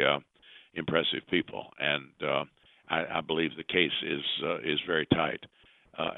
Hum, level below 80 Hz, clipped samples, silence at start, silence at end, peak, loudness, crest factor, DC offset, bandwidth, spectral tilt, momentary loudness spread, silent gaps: none; -64 dBFS; under 0.1%; 0 s; 0 s; -8 dBFS; -30 LUFS; 24 dB; under 0.1%; 4.2 kHz; -8 dB/octave; 10 LU; none